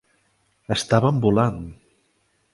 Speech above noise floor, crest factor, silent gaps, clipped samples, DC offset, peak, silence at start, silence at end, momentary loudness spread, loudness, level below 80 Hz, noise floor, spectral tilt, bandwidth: 47 dB; 22 dB; none; under 0.1%; under 0.1%; -2 dBFS; 0.7 s; 0.8 s; 16 LU; -21 LUFS; -48 dBFS; -67 dBFS; -6 dB/octave; 11.5 kHz